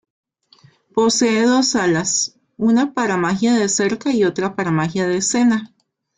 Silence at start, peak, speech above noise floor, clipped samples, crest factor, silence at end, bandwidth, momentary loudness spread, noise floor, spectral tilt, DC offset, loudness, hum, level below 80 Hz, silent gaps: 0.95 s; -4 dBFS; 35 dB; under 0.1%; 14 dB; 0.5 s; 9.6 kHz; 5 LU; -52 dBFS; -4 dB/octave; under 0.1%; -17 LUFS; none; -58 dBFS; none